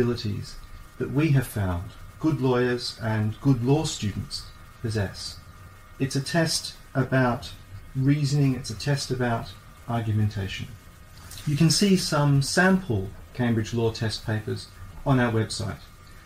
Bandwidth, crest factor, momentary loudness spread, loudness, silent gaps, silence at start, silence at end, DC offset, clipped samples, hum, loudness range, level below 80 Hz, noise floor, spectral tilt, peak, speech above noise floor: 16 kHz; 18 dB; 15 LU; -25 LUFS; none; 0 s; 0 s; under 0.1%; under 0.1%; none; 5 LU; -46 dBFS; -46 dBFS; -5.5 dB/octave; -8 dBFS; 22 dB